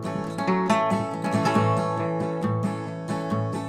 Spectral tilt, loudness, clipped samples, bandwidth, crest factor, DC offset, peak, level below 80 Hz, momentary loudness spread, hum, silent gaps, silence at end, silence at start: -7 dB/octave; -25 LUFS; under 0.1%; 14 kHz; 18 dB; under 0.1%; -8 dBFS; -60 dBFS; 8 LU; none; none; 0 s; 0 s